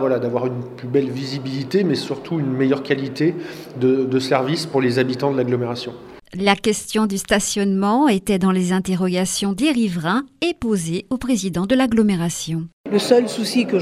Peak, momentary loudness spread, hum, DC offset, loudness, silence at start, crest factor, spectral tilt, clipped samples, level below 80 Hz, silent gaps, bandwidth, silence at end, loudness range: 0 dBFS; 8 LU; none; under 0.1%; -20 LUFS; 0 s; 18 dB; -5 dB/octave; under 0.1%; -50 dBFS; 12.73-12.84 s; 15 kHz; 0 s; 3 LU